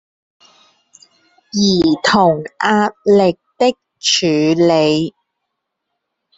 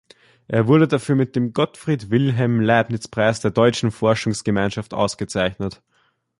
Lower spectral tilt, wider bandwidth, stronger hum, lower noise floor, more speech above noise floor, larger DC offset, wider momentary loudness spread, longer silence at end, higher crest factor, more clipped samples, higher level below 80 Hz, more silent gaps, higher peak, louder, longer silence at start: second, -4.5 dB/octave vs -6 dB/octave; second, 8.2 kHz vs 11.5 kHz; neither; first, -75 dBFS vs -64 dBFS; first, 62 dB vs 45 dB; neither; about the same, 6 LU vs 7 LU; first, 1.3 s vs 0.65 s; about the same, 16 dB vs 18 dB; neither; about the same, -52 dBFS vs -50 dBFS; neither; about the same, 0 dBFS vs -2 dBFS; first, -14 LUFS vs -20 LUFS; first, 1.55 s vs 0.5 s